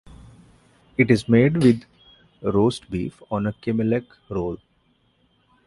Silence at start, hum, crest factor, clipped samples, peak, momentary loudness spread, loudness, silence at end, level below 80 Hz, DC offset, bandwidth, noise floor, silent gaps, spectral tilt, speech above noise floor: 1 s; none; 20 dB; under 0.1%; -2 dBFS; 14 LU; -22 LUFS; 1.1 s; -50 dBFS; under 0.1%; 11.5 kHz; -64 dBFS; none; -7.5 dB/octave; 43 dB